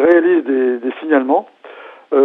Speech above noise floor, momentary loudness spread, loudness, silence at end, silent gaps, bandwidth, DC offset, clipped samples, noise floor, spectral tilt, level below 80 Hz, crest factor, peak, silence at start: 21 dB; 8 LU; -15 LUFS; 0 s; none; 3.9 kHz; under 0.1%; under 0.1%; -37 dBFS; -7.5 dB/octave; -64 dBFS; 14 dB; 0 dBFS; 0 s